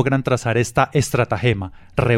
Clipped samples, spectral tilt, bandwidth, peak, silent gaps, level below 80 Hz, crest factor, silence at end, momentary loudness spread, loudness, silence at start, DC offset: under 0.1%; -6 dB/octave; 15.5 kHz; -4 dBFS; none; -40 dBFS; 16 dB; 0 s; 5 LU; -20 LUFS; 0 s; under 0.1%